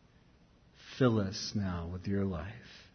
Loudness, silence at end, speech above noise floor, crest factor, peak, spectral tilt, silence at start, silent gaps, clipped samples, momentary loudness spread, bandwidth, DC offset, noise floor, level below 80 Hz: -34 LUFS; 0.05 s; 30 dB; 20 dB; -16 dBFS; -6 dB/octave; 0.8 s; none; under 0.1%; 17 LU; 6.4 kHz; under 0.1%; -63 dBFS; -56 dBFS